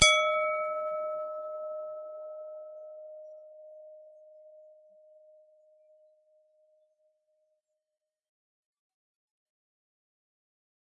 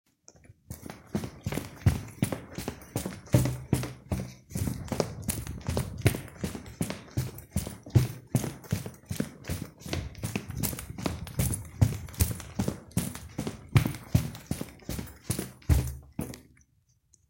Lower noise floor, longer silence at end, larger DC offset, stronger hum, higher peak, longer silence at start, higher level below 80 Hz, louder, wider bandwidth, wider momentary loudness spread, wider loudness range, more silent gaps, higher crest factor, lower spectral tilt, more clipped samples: first, -89 dBFS vs -68 dBFS; first, 6.25 s vs 0.9 s; neither; neither; about the same, -4 dBFS vs -4 dBFS; second, 0 s vs 0.5 s; second, -62 dBFS vs -44 dBFS; about the same, -31 LUFS vs -32 LUFS; second, 11 kHz vs 16.5 kHz; first, 26 LU vs 11 LU; first, 25 LU vs 3 LU; neither; about the same, 32 dB vs 28 dB; second, -0.5 dB/octave vs -5.5 dB/octave; neither